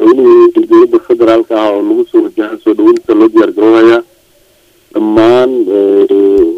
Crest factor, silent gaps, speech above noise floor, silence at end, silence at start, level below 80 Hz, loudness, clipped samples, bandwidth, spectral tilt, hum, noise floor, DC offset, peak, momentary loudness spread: 8 dB; none; 40 dB; 0 s; 0 s; -46 dBFS; -8 LUFS; 2%; 6.4 kHz; -6.5 dB/octave; none; -47 dBFS; under 0.1%; 0 dBFS; 7 LU